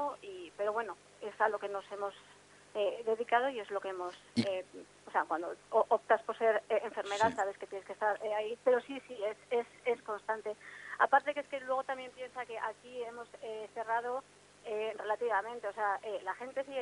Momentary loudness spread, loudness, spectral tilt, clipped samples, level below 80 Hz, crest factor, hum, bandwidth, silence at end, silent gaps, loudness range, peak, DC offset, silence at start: 14 LU; -35 LUFS; -4 dB/octave; under 0.1%; -80 dBFS; 22 dB; 50 Hz at -70 dBFS; 11 kHz; 0 s; none; 5 LU; -14 dBFS; under 0.1%; 0 s